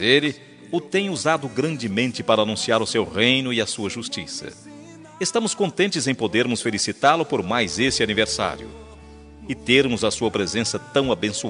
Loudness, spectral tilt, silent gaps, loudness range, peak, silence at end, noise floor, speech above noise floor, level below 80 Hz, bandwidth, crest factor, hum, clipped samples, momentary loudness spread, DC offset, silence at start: -21 LUFS; -3.5 dB/octave; none; 2 LU; -2 dBFS; 0 s; -43 dBFS; 21 dB; -52 dBFS; 11 kHz; 20 dB; none; under 0.1%; 12 LU; under 0.1%; 0 s